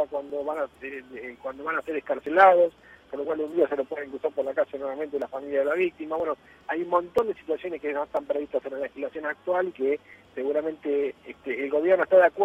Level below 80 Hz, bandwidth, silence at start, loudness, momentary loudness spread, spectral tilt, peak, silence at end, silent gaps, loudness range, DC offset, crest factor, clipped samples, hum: -66 dBFS; 7.6 kHz; 0 s; -26 LUFS; 14 LU; -6 dB/octave; -4 dBFS; 0 s; none; 5 LU; under 0.1%; 22 dB; under 0.1%; none